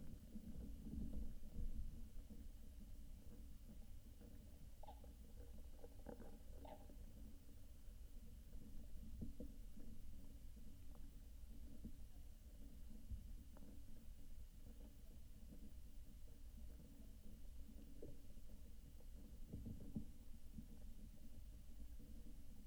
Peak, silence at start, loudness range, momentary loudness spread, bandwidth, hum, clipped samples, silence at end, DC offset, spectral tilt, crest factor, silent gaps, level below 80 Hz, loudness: -36 dBFS; 0 s; 5 LU; 8 LU; over 20 kHz; none; under 0.1%; 0 s; under 0.1%; -6.5 dB/octave; 16 dB; none; -56 dBFS; -61 LUFS